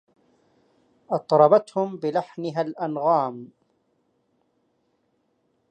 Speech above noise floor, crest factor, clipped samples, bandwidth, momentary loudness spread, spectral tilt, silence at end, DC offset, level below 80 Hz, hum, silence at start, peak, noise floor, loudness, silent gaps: 48 dB; 22 dB; under 0.1%; 9 kHz; 13 LU; -7.5 dB/octave; 2.25 s; under 0.1%; -80 dBFS; none; 1.1 s; -4 dBFS; -70 dBFS; -23 LUFS; none